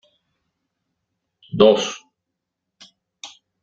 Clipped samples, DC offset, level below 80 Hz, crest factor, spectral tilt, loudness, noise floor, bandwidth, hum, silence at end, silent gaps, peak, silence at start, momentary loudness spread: under 0.1%; under 0.1%; -62 dBFS; 22 dB; -4.5 dB/octave; -17 LUFS; -81 dBFS; 7.8 kHz; none; 0.35 s; none; -2 dBFS; 1.55 s; 25 LU